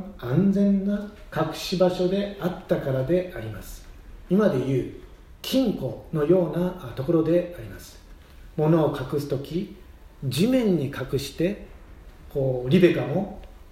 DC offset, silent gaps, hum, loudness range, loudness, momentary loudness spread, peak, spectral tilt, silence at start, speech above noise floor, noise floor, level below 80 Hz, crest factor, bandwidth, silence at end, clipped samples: under 0.1%; none; none; 3 LU; -24 LUFS; 16 LU; -6 dBFS; -7 dB/octave; 0 s; 22 dB; -46 dBFS; -46 dBFS; 20 dB; 16 kHz; 0.05 s; under 0.1%